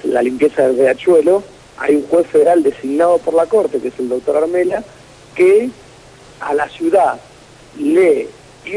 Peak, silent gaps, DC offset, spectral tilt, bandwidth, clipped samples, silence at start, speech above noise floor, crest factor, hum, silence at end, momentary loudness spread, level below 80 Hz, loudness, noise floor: -2 dBFS; none; under 0.1%; -5.5 dB/octave; 11 kHz; under 0.1%; 0 s; 27 dB; 12 dB; none; 0 s; 10 LU; -52 dBFS; -14 LUFS; -41 dBFS